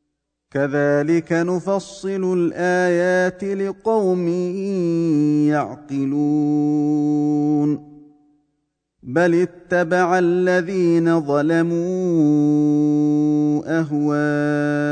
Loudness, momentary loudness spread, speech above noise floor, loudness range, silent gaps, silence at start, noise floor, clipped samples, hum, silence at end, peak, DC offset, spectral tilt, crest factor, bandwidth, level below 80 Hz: -19 LUFS; 6 LU; 57 dB; 3 LU; none; 0.55 s; -75 dBFS; under 0.1%; none; 0 s; -4 dBFS; under 0.1%; -7.5 dB/octave; 14 dB; 9.2 kHz; -62 dBFS